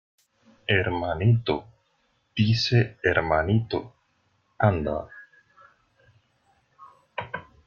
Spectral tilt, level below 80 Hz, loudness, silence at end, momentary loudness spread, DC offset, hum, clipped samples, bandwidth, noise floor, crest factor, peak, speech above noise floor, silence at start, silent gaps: -7 dB/octave; -50 dBFS; -25 LUFS; 0.25 s; 14 LU; under 0.1%; none; under 0.1%; 7 kHz; -69 dBFS; 20 dB; -6 dBFS; 46 dB; 0.7 s; none